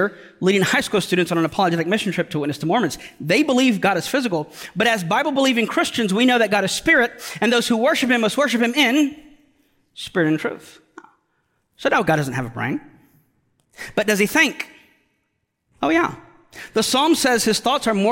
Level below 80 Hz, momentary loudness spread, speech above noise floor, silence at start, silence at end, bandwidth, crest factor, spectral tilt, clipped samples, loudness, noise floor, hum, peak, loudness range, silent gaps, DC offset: -56 dBFS; 9 LU; 53 dB; 0 s; 0 s; 17 kHz; 16 dB; -4 dB/octave; under 0.1%; -19 LUFS; -72 dBFS; none; -4 dBFS; 6 LU; none; under 0.1%